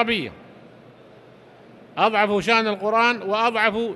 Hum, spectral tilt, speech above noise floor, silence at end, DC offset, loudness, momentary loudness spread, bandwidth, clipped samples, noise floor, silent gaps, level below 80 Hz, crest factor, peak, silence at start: none; -4.5 dB/octave; 27 dB; 0 s; under 0.1%; -20 LUFS; 6 LU; 12 kHz; under 0.1%; -48 dBFS; none; -60 dBFS; 20 dB; -4 dBFS; 0 s